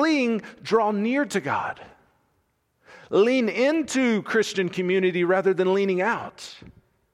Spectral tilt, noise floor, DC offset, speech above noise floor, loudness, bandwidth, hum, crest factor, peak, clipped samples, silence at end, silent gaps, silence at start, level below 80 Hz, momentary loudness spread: -5 dB/octave; -70 dBFS; under 0.1%; 47 dB; -23 LUFS; 12.5 kHz; none; 16 dB; -8 dBFS; under 0.1%; 0.45 s; none; 0 s; -66 dBFS; 9 LU